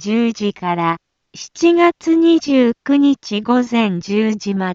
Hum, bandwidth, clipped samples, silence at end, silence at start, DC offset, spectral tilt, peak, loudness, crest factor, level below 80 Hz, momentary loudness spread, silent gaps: none; 7.6 kHz; under 0.1%; 0 s; 0 s; under 0.1%; -5.5 dB/octave; -2 dBFS; -16 LUFS; 14 dB; -60 dBFS; 8 LU; none